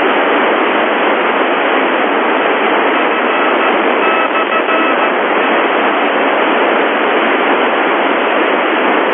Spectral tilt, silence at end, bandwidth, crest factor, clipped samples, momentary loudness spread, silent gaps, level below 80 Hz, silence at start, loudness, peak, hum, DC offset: -9 dB/octave; 0 s; 4.1 kHz; 12 dB; under 0.1%; 1 LU; none; -76 dBFS; 0 s; -12 LUFS; 0 dBFS; none; under 0.1%